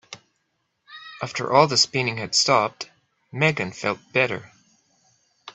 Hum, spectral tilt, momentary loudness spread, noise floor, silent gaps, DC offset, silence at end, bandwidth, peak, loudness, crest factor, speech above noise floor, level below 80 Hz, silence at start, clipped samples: none; -3 dB/octave; 21 LU; -73 dBFS; none; under 0.1%; 0.05 s; 8.4 kHz; -2 dBFS; -21 LUFS; 24 dB; 51 dB; -66 dBFS; 0.1 s; under 0.1%